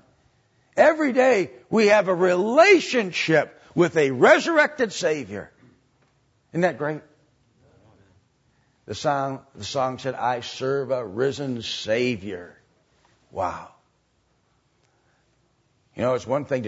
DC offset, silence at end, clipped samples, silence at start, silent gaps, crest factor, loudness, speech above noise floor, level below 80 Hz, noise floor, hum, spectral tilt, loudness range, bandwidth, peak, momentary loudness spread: under 0.1%; 0 s; under 0.1%; 0.75 s; none; 20 dB; -22 LUFS; 45 dB; -66 dBFS; -67 dBFS; none; -5 dB/octave; 13 LU; 8 kHz; -4 dBFS; 15 LU